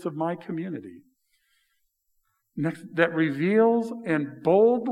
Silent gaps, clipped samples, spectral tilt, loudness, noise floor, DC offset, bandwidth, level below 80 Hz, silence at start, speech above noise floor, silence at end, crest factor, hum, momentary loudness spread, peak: none; under 0.1%; -8 dB/octave; -25 LUFS; -73 dBFS; under 0.1%; 10.5 kHz; -82 dBFS; 0 s; 49 dB; 0 s; 20 dB; none; 13 LU; -4 dBFS